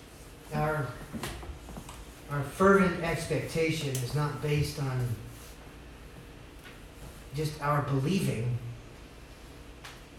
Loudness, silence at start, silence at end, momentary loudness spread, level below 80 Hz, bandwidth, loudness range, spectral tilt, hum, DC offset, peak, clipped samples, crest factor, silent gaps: -30 LUFS; 0 s; 0 s; 21 LU; -50 dBFS; 17 kHz; 7 LU; -6 dB/octave; none; under 0.1%; -12 dBFS; under 0.1%; 20 dB; none